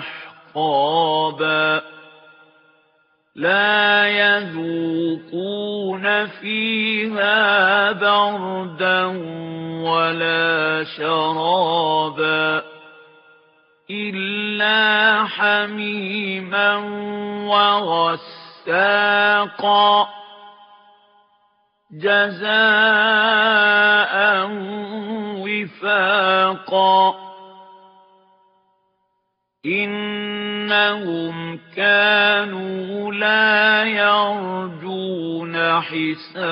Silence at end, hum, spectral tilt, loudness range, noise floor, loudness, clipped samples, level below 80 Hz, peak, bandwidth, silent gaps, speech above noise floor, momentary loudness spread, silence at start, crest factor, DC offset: 0 s; none; -0.5 dB/octave; 6 LU; -72 dBFS; -18 LUFS; under 0.1%; -74 dBFS; -2 dBFS; 5.4 kHz; none; 54 dB; 13 LU; 0 s; 18 dB; under 0.1%